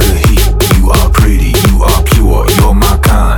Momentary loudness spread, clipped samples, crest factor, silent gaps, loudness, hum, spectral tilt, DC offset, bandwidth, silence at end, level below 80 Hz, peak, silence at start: 1 LU; 0.3%; 6 dB; none; -9 LUFS; none; -5 dB/octave; under 0.1%; over 20 kHz; 0 s; -8 dBFS; 0 dBFS; 0 s